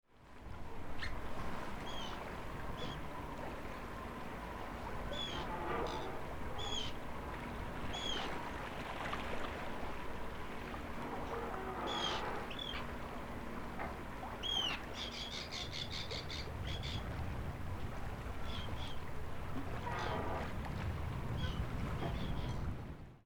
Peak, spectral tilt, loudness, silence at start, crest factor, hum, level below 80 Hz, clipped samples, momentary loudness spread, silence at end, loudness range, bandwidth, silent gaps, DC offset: -26 dBFS; -4.5 dB/octave; -43 LUFS; 0.1 s; 16 dB; none; -48 dBFS; under 0.1%; 7 LU; 0.05 s; 4 LU; over 20 kHz; none; under 0.1%